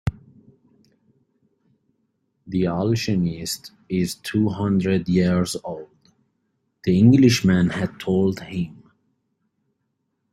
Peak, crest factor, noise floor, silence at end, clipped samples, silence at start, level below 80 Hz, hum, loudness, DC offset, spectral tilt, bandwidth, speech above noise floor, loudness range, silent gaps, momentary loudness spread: -4 dBFS; 18 dB; -74 dBFS; 1.6 s; under 0.1%; 0.05 s; -50 dBFS; none; -21 LUFS; under 0.1%; -6.5 dB/octave; 14 kHz; 54 dB; 7 LU; none; 15 LU